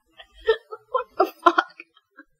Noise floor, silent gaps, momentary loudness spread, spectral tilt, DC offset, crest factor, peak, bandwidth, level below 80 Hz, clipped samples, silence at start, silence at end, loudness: -54 dBFS; none; 9 LU; -3.5 dB/octave; under 0.1%; 24 dB; -2 dBFS; 16 kHz; -60 dBFS; under 0.1%; 0.45 s; 0.75 s; -23 LUFS